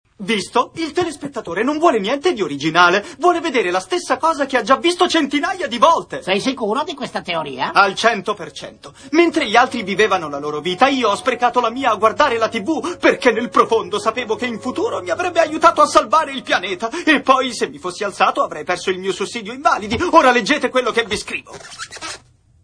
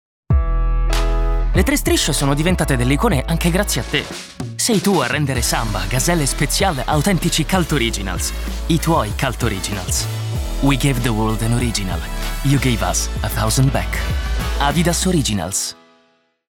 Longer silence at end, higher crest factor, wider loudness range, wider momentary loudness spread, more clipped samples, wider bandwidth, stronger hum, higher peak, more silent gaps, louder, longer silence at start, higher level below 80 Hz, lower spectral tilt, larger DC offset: second, 0.45 s vs 0.75 s; about the same, 18 dB vs 14 dB; about the same, 2 LU vs 2 LU; first, 11 LU vs 6 LU; neither; second, 10.5 kHz vs 19 kHz; neither; first, 0 dBFS vs -4 dBFS; neither; about the same, -17 LUFS vs -18 LUFS; about the same, 0.2 s vs 0.3 s; second, -52 dBFS vs -24 dBFS; about the same, -3.5 dB/octave vs -4.5 dB/octave; neither